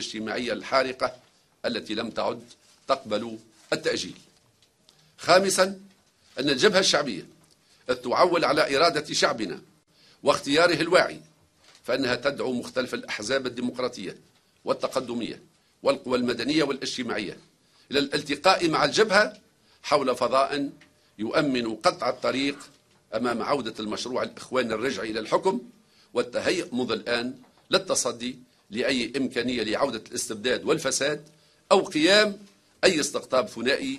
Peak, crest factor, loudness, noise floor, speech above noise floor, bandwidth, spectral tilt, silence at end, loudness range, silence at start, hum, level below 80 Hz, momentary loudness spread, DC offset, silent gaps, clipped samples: -2 dBFS; 24 dB; -25 LUFS; -63 dBFS; 38 dB; 13 kHz; -3 dB/octave; 0 s; 6 LU; 0 s; none; -64 dBFS; 14 LU; under 0.1%; none; under 0.1%